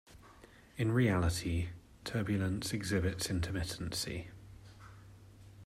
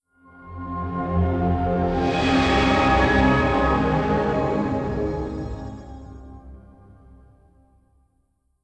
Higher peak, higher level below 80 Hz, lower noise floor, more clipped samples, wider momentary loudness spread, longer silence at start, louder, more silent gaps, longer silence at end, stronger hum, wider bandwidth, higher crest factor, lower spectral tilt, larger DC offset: second, -18 dBFS vs -6 dBFS; second, -54 dBFS vs -34 dBFS; second, -58 dBFS vs -67 dBFS; neither; first, 24 LU vs 21 LU; second, 0.1 s vs 0.35 s; second, -35 LUFS vs -21 LUFS; neither; second, 0 s vs 2.05 s; neither; first, 15.5 kHz vs 9 kHz; about the same, 18 dB vs 18 dB; second, -5.5 dB/octave vs -7 dB/octave; neither